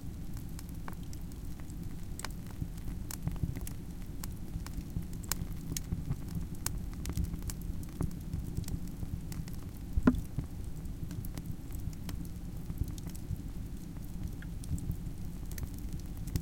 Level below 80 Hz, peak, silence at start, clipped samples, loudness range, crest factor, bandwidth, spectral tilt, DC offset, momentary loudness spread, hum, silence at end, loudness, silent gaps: -42 dBFS; -10 dBFS; 0 s; under 0.1%; 5 LU; 26 dB; 17 kHz; -5.5 dB/octave; under 0.1%; 6 LU; none; 0 s; -40 LUFS; none